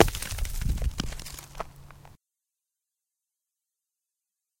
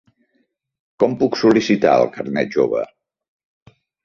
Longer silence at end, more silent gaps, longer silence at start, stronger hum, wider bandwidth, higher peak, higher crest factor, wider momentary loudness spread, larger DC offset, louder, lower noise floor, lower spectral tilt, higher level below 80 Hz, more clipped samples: first, 2.45 s vs 1.2 s; neither; second, 0 s vs 1 s; neither; first, 17 kHz vs 7.2 kHz; about the same, 0 dBFS vs -2 dBFS; first, 32 dB vs 18 dB; first, 20 LU vs 8 LU; neither; second, -33 LUFS vs -17 LUFS; first, -87 dBFS vs -67 dBFS; second, -4 dB/octave vs -6 dB/octave; first, -36 dBFS vs -58 dBFS; neither